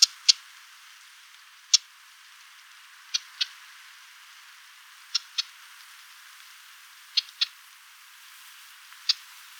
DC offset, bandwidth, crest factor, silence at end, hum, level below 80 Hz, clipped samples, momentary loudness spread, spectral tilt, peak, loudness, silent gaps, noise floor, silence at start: under 0.1%; over 20 kHz; 32 dB; 0.45 s; none; under -90 dBFS; under 0.1%; 26 LU; 12 dB/octave; -2 dBFS; -26 LUFS; none; -52 dBFS; 0 s